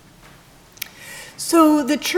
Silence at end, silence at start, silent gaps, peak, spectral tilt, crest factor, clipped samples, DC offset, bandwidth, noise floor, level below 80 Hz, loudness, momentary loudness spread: 0 s; 1 s; none; -2 dBFS; -2.5 dB/octave; 18 dB; under 0.1%; under 0.1%; 19.5 kHz; -47 dBFS; -56 dBFS; -16 LUFS; 21 LU